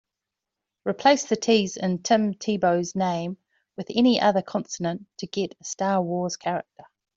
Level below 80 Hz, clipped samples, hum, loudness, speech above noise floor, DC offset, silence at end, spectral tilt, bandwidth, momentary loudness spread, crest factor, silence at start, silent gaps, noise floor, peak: -66 dBFS; under 0.1%; none; -24 LUFS; 62 dB; under 0.1%; 0.55 s; -4.5 dB/octave; 7.8 kHz; 12 LU; 18 dB; 0.85 s; none; -86 dBFS; -6 dBFS